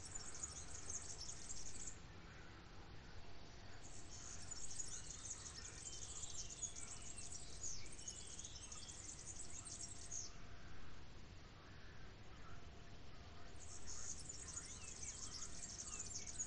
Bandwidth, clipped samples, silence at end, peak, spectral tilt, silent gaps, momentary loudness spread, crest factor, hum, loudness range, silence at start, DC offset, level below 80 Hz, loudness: 10 kHz; under 0.1%; 0 s; -34 dBFS; -1.5 dB/octave; none; 12 LU; 16 dB; none; 6 LU; 0 s; 0.1%; -62 dBFS; -52 LUFS